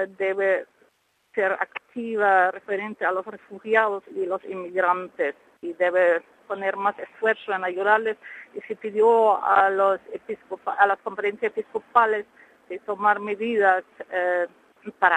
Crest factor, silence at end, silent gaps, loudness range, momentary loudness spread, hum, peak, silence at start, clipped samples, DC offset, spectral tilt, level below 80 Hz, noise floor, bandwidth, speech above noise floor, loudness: 20 dB; 0 s; none; 3 LU; 16 LU; none; -4 dBFS; 0 s; under 0.1%; under 0.1%; -5.5 dB/octave; -76 dBFS; -66 dBFS; 9.6 kHz; 42 dB; -23 LUFS